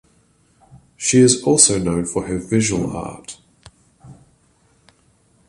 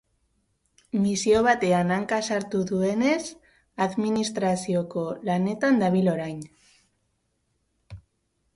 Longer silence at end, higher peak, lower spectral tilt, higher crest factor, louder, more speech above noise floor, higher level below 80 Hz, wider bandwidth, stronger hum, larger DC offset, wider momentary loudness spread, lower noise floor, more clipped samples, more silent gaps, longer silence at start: first, 1.35 s vs 0.55 s; first, 0 dBFS vs -8 dBFS; second, -4 dB/octave vs -5.5 dB/octave; about the same, 20 dB vs 18 dB; first, -16 LUFS vs -24 LUFS; second, 41 dB vs 49 dB; first, -46 dBFS vs -58 dBFS; about the same, 11.5 kHz vs 11.5 kHz; neither; neither; first, 18 LU vs 10 LU; second, -58 dBFS vs -73 dBFS; neither; neither; second, 0.75 s vs 0.95 s